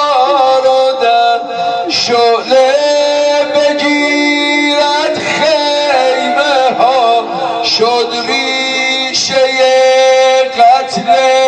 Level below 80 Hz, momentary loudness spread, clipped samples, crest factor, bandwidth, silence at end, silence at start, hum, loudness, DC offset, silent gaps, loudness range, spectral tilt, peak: -58 dBFS; 5 LU; under 0.1%; 10 dB; 9.4 kHz; 0 s; 0 s; none; -10 LUFS; under 0.1%; none; 1 LU; -2 dB/octave; 0 dBFS